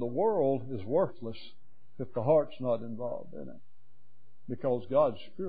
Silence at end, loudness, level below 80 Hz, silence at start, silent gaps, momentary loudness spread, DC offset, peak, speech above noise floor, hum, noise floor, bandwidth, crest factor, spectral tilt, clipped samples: 0 s; -31 LUFS; -72 dBFS; 0 s; none; 16 LU; 1%; -14 dBFS; 39 dB; none; -70 dBFS; 4.8 kHz; 18 dB; -7.5 dB/octave; under 0.1%